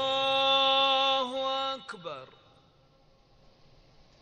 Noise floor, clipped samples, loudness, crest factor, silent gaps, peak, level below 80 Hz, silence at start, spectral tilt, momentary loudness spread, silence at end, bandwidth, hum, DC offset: -62 dBFS; under 0.1%; -26 LUFS; 18 dB; none; -14 dBFS; -68 dBFS; 0 s; -2.5 dB/octave; 18 LU; 1.95 s; 9.4 kHz; none; under 0.1%